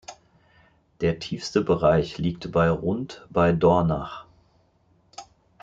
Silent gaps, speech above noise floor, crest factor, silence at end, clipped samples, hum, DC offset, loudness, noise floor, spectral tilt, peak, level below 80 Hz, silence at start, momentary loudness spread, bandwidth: none; 40 dB; 20 dB; 0.4 s; under 0.1%; none; under 0.1%; -23 LUFS; -63 dBFS; -7 dB/octave; -6 dBFS; -48 dBFS; 0.1 s; 25 LU; 7.8 kHz